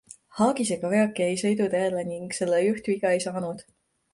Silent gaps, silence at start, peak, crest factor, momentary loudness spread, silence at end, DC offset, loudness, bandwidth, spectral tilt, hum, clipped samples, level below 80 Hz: none; 0.1 s; -10 dBFS; 16 dB; 9 LU; 0.55 s; under 0.1%; -25 LUFS; 11.5 kHz; -5 dB/octave; none; under 0.1%; -68 dBFS